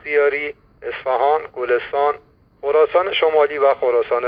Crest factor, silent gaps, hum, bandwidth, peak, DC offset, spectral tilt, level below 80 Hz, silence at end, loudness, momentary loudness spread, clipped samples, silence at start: 14 dB; none; none; 5.2 kHz; -4 dBFS; under 0.1%; -6 dB/octave; -56 dBFS; 0 s; -18 LUFS; 13 LU; under 0.1%; 0.05 s